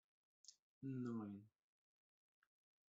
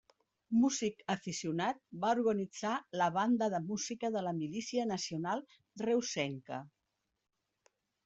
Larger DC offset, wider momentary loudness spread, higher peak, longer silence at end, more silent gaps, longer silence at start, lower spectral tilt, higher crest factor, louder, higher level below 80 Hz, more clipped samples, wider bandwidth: neither; first, 18 LU vs 7 LU; second, -38 dBFS vs -18 dBFS; about the same, 1.4 s vs 1.4 s; first, 0.59-0.81 s vs none; about the same, 0.45 s vs 0.5 s; first, -8 dB/octave vs -4.5 dB/octave; about the same, 18 dB vs 18 dB; second, -51 LUFS vs -35 LUFS; second, under -90 dBFS vs -76 dBFS; neither; about the same, 7.6 kHz vs 8.2 kHz